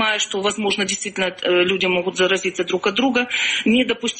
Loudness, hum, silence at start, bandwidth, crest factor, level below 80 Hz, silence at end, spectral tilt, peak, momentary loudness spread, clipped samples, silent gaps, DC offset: -19 LUFS; none; 0 s; 8.8 kHz; 14 dB; -58 dBFS; 0 s; -3 dB/octave; -6 dBFS; 5 LU; under 0.1%; none; under 0.1%